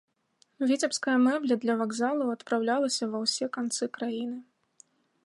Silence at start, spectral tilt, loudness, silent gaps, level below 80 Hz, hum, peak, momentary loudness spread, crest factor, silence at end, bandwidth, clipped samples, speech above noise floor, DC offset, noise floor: 0.6 s; -3 dB/octave; -28 LUFS; none; -84 dBFS; none; -14 dBFS; 8 LU; 16 dB; 0.85 s; 11.5 kHz; under 0.1%; 41 dB; under 0.1%; -69 dBFS